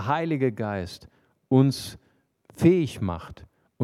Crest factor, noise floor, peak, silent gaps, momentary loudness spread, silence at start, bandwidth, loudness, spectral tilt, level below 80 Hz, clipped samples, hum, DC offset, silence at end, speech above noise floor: 20 dB; -59 dBFS; -6 dBFS; none; 18 LU; 0 s; 14 kHz; -24 LUFS; -7.5 dB/octave; -54 dBFS; under 0.1%; none; under 0.1%; 0 s; 35 dB